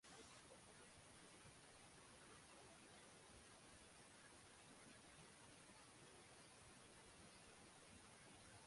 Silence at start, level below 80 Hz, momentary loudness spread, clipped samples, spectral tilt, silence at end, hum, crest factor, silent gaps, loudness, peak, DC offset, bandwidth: 0.05 s; -80 dBFS; 1 LU; under 0.1%; -2.5 dB/octave; 0 s; none; 16 dB; none; -64 LUFS; -50 dBFS; under 0.1%; 11.5 kHz